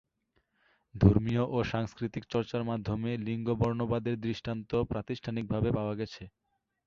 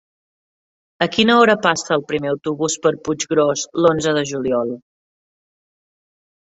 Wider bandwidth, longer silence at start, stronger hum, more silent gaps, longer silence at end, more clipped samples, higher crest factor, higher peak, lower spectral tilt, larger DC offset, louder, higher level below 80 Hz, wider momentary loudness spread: second, 7 kHz vs 8 kHz; about the same, 0.95 s vs 1 s; neither; neither; second, 0.6 s vs 1.7 s; neither; about the same, 22 dB vs 18 dB; second, -10 dBFS vs -2 dBFS; first, -8.5 dB/octave vs -4 dB/octave; neither; second, -32 LUFS vs -18 LUFS; first, -48 dBFS vs -56 dBFS; about the same, 11 LU vs 10 LU